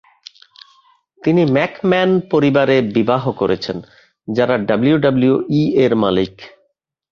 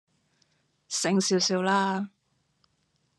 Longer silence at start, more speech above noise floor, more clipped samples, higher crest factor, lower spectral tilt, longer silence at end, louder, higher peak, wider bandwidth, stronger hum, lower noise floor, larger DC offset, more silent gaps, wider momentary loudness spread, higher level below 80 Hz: first, 1.25 s vs 0.9 s; first, 51 dB vs 47 dB; neither; about the same, 16 dB vs 18 dB; first, -8 dB/octave vs -3.5 dB/octave; second, 0.65 s vs 1.1 s; first, -16 LUFS vs -26 LUFS; first, -2 dBFS vs -12 dBFS; second, 7 kHz vs 12 kHz; neither; second, -66 dBFS vs -72 dBFS; neither; neither; about the same, 8 LU vs 10 LU; first, -52 dBFS vs -78 dBFS